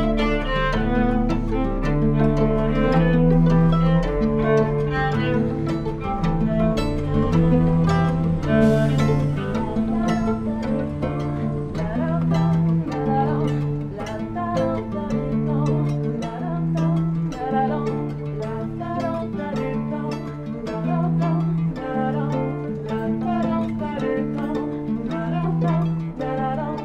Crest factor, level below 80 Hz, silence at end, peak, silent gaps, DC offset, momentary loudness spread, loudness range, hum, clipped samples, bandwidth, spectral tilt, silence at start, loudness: 16 dB; -32 dBFS; 0 s; -6 dBFS; none; under 0.1%; 9 LU; 5 LU; none; under 0.1%; 8.4 kHz; -8.5 dB/octave; 0 s; -22 LUFS